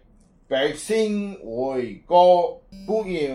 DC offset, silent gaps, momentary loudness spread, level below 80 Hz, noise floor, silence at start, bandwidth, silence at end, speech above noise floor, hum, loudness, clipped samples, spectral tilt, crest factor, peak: under 0.1%; none; 13 LU; -54 dBFS; -55 dBFS; 0.5 s; 12.5 kHz; 0 s; 34 dB; none; -22 LUFS; under 0.1%; -5 dB/octave; 18 dB; -4 dBFS